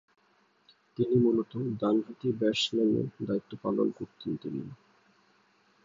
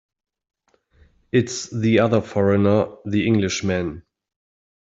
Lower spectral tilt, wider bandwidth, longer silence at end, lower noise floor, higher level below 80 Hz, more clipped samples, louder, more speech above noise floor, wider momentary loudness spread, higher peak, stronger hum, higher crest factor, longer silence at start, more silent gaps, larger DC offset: about the same, -6.5 dB/octave vs -6 dB/octave; about the same, 7.6 kHz vs 8 kHz; first, 1.1 s vs 0.95 s; first, -68 dBFS vs -58 dBFS; second, -68 dBFS vs -56 dBFS; neither; second, -30 LUFS vs -20 LUFS; about the same, 39 dB vs 38 dB; first, 13 LU vs 8 LU; second, -14 dBFS vs -4 dBFS; neither; about the same, 18 dB vs 18 dB; second, 1 s vs 1.35 s; neither; neither